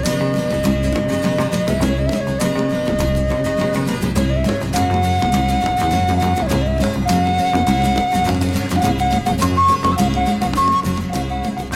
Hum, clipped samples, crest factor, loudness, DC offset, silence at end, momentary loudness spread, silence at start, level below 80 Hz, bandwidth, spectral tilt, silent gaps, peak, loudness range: none; under 0.1%; 14 dB; -18 LUFS; under 0.1%; 0 s; 3 LU; 0 s; -28 dBFS; 17 kHz; -6 dB/octave; none; -4 dBFS; 2 LU